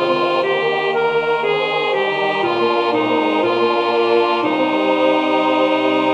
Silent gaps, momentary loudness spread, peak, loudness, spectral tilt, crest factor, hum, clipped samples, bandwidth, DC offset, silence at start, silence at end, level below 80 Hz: none; 2 LU; -2 dBFS; -16 LUFS; -5.5 dB/octave; 14 dB; none; under 0.1%; 9.2 kHz; under 0.1%; 0 s; 0 s; -64 dBFS